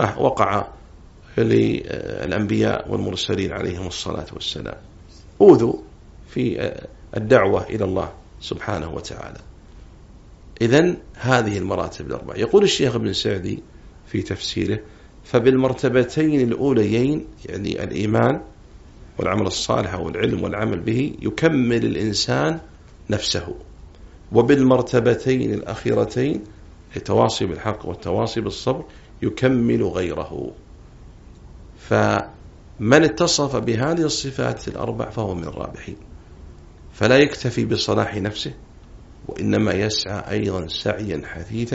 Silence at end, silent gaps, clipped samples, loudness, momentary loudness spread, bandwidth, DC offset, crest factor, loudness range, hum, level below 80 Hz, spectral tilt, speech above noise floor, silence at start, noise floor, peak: 0 s; none; under 0.1%; -21 LUFS; 15 LU; 8 kHz; under 0.1%; 22 dB; 4 LU; none; -44 dBFS; -5 dB/octave; 24 dB; 0 s; -44 dBFS; 0 dBFS